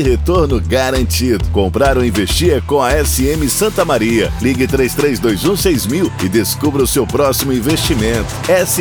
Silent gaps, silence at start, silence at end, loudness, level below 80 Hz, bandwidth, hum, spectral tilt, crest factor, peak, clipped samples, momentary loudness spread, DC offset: none; 0 s; 0 s; -14 LUFS; -24 dBFS; over 20 kHz; none; -4.5 dB/octave; 12 dB; 0 dBFS; under 0.1%; 2 LU; under 0.1%